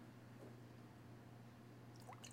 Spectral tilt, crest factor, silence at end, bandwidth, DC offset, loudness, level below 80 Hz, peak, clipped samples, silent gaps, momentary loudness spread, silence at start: -5 dB/octave; 16 dB; 0 s; 16 kHz; under 0.1%; -60 LUFS; -82 dBFS; -42 dBFS; under 0.1%; none; 2 LU; 0 s